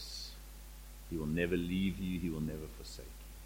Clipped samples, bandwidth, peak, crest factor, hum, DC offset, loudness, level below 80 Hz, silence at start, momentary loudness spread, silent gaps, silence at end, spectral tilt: under 0.1%; 16.5 kHz; -20 dBFS; 20 dB; none; under 0.1%; -38 LUFS; -50 dBFS; 0 s; 18 LU; none; 0 s; -6 dB/octave